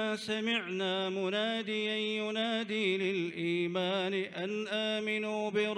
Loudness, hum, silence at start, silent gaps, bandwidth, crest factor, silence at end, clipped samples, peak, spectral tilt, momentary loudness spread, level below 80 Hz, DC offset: -33 LUFS; none; 0 s; none; 11.5 kHz; 14 dB; 0 s; under 0.1%; -20 dBFS; -5 dB/octave; 2 LU; -82 dBFS; under 0.1%